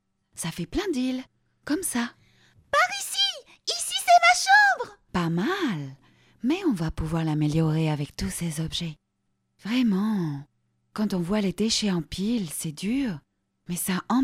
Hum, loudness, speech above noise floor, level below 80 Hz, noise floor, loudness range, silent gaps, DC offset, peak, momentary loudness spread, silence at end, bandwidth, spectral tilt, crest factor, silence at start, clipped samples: none; -25 LUFS; 49 dB; -48 dBFS; -75 dBFS; 7 LU; none; under 0.1%; -6 dBFS; 16 LU; 0 s; 16 kHz; -4 dB/octave; 20 dB; 0.35 s; under 0.1%